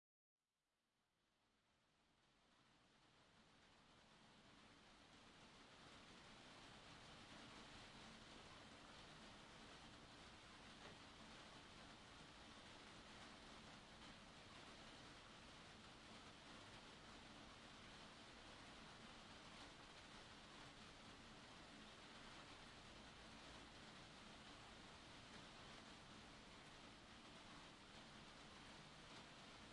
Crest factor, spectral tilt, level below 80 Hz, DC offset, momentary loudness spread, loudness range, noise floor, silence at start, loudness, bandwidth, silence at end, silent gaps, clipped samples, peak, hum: 16 dB; -3 dB/octave; -76 dBFS; under 0.1%; 2 LU; 2 LU; under -90 dBFS; 1.15 s; -62 LUFS; 11 kHz; 0 s; none; under 0.1%; -48 dBFS; none